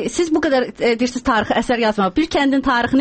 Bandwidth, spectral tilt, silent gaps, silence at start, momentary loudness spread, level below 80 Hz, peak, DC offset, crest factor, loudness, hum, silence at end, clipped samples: 8.8 kHz; -4.5 dB/octave; none; 0 s; 2 LU; -42 dBFS; -6 dBFS; under 0.1%; 12 dB; -17 LUFS; none; 0 s; under 0.1%